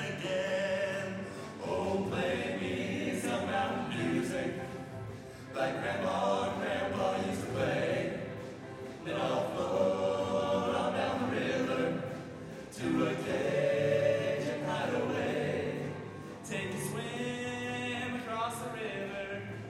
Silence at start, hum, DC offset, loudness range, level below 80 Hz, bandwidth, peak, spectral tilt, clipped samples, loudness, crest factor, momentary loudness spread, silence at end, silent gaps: 0 s; none; under 0.1%; 4 LU; -64 dBFS; 15.5 kHz; -18 dBFS; -5.5 dB/octave; under 0.1%; -34 LUFS; 16 dB; 11 LU; 0 s; none